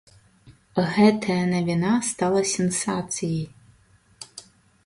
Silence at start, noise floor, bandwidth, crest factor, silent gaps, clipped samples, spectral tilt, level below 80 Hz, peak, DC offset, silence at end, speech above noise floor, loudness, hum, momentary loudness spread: 0.45 s; -58 dBFS; 11.5 kHz; 20 dB; none; under 0.1%; -5 dB/octave; -58 dBFS; -4 dBFS; under 0.1%; 0.45 s; 36 dB; -23 LUFS; none; 22 LU